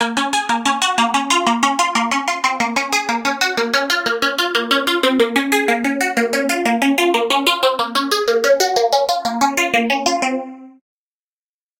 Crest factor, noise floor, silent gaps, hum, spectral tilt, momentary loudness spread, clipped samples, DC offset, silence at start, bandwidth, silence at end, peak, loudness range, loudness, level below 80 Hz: 16 dB; under -90 dBFS; none; none; -1.5 dB/octave; 3 LU; under 0.1%; under 0.1%; 0 s; 17 kHz; 1.1 s; -2 dBFS; 1 LU; -16 LUFS; -62 dBFS